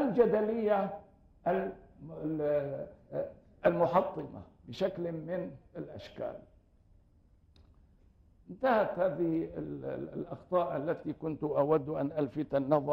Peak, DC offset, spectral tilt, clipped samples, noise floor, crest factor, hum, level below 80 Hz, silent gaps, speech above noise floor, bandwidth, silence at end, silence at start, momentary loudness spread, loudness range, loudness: -14 dBFS; under 0.1%; -9 dB/octave; under 0.1%; -64 dBFS; 20 dB; none; -62 dBFS; none; 32 dB; 16 kHz; 0 s; 0 s; 16 LU; 8 LU; -33 LUFS